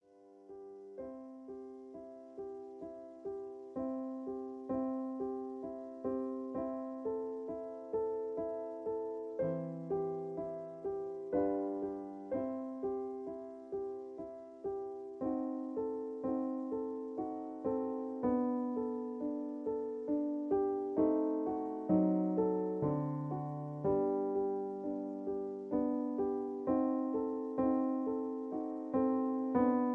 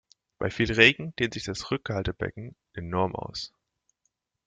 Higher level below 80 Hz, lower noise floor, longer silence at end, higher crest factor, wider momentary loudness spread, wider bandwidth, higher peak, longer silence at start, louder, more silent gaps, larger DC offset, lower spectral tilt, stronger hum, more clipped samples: second, -70 dBFS vs -50 dBFS; second, -60 dBFS vs -78 dBFS; second, 0 s vs 1 s; second, 18 dB vs 28 dB; second, 14 LU vs 21 LU; second, 2.8 kHz vs 9.4 kHz; second, -18 dBFS vs -2 dBFS; second, 0.15 s vs 0.4 s; second, -38 LUFS vs -26 LUFS; neither; neither; first, -11 dB/octave vs -4.5 dB/octave; neither; neither